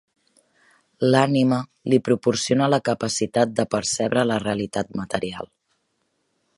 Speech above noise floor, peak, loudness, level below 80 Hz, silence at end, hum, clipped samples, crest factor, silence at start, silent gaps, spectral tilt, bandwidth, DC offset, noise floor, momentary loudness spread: 50 dB; -2 dBFS; -22 LUFS; -58 dBFS; 1.15 s; none; under 0.1%; 20 dB; 1 s; none; -5 dB/octave; 11.5 kHz; under 0.1%; -72 dBFS; 9 LU